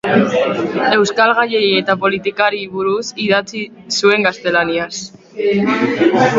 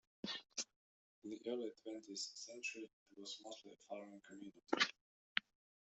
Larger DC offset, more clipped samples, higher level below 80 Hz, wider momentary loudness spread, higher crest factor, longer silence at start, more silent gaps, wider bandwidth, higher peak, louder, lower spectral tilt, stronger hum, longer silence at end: neither; neither; first, -56 dBFS vs under -90 dBFS; second, 8 LU vs 18 LU; second, 14 dB vs 34 dB; second, 0.05 s vs 0.25 s; second, none vs 0.76-1.22 s, 2.93-3.06 s, 5.01-5.35 s; about the same, 7.8 kHz vs 8.2 kHz; first, 0 dBFS vs -14 dBFS; first, -15 LUFS vs -46 LUFS; first, -4.5 dB/octave vs -1.5 dB/octave; neither; second, 0 s vs 0.45 s